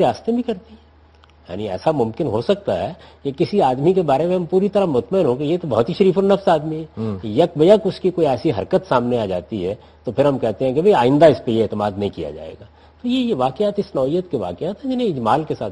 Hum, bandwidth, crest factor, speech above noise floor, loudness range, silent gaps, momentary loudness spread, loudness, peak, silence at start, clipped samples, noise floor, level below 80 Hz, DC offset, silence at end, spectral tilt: none; 11.5 kHz; 18 dB; 31 dB; 5 LU; none; 13 LU; -19 LUFS; 0 dBFS; 0 s; under 0.1%; -49 dBFS; -52 dBFS; under 0.1%; 0 s; -8 dB/octave